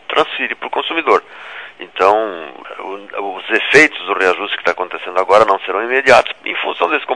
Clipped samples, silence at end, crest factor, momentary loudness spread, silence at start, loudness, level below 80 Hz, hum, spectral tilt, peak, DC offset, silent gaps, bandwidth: 0.5%; 0 s; 16 dB; 18 LU; 0.1 s; -14 LUFS; -56 dBFS; none; -3 dB/octave; 0 dBFS; 0.3%; none; 11 kHz